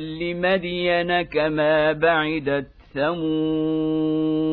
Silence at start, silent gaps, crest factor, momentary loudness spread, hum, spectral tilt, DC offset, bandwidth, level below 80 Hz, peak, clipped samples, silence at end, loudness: 0 s; none; 16 dB; 7 LU; none; -9 dB/octave; under 0.1%; 4.8 kHz; -50 dBFS; -6 dBFS; under 0.1%; 0 s; -22 LUFS